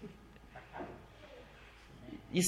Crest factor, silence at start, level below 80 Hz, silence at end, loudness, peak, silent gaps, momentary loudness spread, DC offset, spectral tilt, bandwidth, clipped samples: 22 dB; 0 s; -62 dBFS; 0 s; -49 LUFS; -20 dBFS; none; 8 LU; under 0.1%; -4 dB/octave; 13.5 kHz; under 0.1%